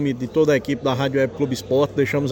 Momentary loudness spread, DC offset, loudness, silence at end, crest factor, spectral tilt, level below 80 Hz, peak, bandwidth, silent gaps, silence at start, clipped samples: 4 LU; under 0.1%; -21 LUFS; 0 s; 14 dB; -6.5 dB/octave; -50 dBFS; -6 dBFS; 17 kHz; none; 0 s; under 0.1%